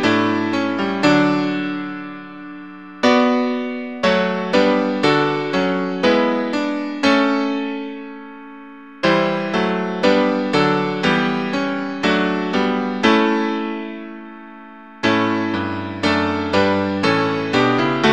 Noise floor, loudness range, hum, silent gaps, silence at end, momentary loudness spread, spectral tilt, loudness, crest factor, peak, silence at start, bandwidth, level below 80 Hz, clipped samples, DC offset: -39 dBFS; 3 LU; none; none; 0 s; 18 LU; -5.5 dB/octave; -18 LUFS; 18 dB; 0 dBFS; 0 s; 9.4 kHz; -56 dBFS; under 0.1%; 0.4%